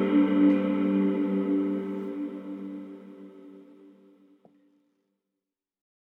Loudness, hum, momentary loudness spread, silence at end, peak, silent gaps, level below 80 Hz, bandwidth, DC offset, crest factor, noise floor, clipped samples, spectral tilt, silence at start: -26 LUFS; none; 23 LU; 2.45 s; -12 dBFS; none; under -90 dBFS; 4 kHz; under 0.1%; 18 dB; -88 dBFS; under 0.1%; -9.5 dB/octave; 0 s